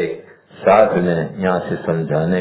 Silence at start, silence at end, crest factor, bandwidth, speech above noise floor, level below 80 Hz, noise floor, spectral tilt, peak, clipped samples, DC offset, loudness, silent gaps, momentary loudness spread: 0 s; 0 s; 18 dB; 4 kHz; 22 dB; -48 dBFS; -38 dBFS; -11.5 dB/octave; 0 dBFS; under 0.1%; under 0.1%; -17 LUFS; none; 9 LU